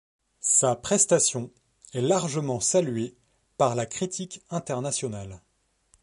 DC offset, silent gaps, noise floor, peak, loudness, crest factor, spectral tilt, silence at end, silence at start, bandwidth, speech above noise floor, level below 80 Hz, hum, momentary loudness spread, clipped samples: under 0.1%; none; -67 dBFS; -8 dBFS; -25 LUFS; 20 dB; -4 dB/octave; 0.65 s; 0.45 s; 11.5 kHz; 41 dB; -62 dBFS; none; 15 LU; under 0.1%